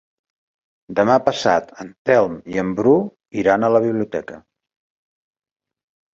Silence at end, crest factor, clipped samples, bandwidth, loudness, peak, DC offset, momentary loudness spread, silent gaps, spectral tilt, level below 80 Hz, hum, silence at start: 1.75 s; 18 dB; under 0.1%; 7.8 kHz; -18 LUFS; -2 dBFS; under 0.1%; 11 LU; 1.98-2.05 s; -6 dB/octave; -56 dBFS; none; 0.9 s